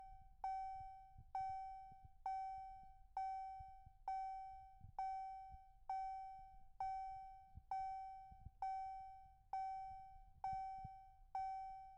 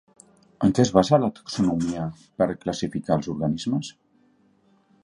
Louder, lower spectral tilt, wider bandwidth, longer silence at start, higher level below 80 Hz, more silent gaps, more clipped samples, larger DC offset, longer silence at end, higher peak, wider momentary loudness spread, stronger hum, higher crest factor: second, -50 LUFS vs -24 LUFS; second, -4.5 dB/octave vs -6.5 dB/octave; second, 8.4 kHz vs 11 kHz; second, 0 s vs 0.6 s; second, -66 dBFS vs -52 dBFS; neither; neither; neither; second, 0 s vs 1.1 s; second, -36 dBFS vs -2 dBFS; about the same, 13 LU vs 11 LU; neither; second, 14 dB vs 24 dB